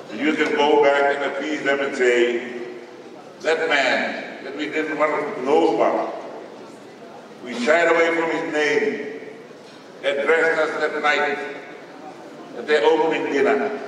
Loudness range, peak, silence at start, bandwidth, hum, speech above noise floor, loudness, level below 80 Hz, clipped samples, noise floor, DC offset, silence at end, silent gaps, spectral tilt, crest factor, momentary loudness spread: 2 LU; -2 dBFS; 0 s; 11 kHz; none; 22 dB; -20 LUFS; -76 dBFS; under 0.1%; -41 dBFS; under 0.1%; 0 s; none; -3.5 dB/octave; 18 dB; 21 LU